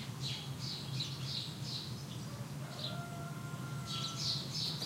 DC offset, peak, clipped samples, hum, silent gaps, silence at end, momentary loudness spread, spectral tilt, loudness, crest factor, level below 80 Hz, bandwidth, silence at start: under 0.1%; -22 dBFS; under 0.1%; none; none; 0 s; 8 LU; -4 dB/octave; -40 LUFS; 18 dB; -66 dBFS; 16 kHz; 0 s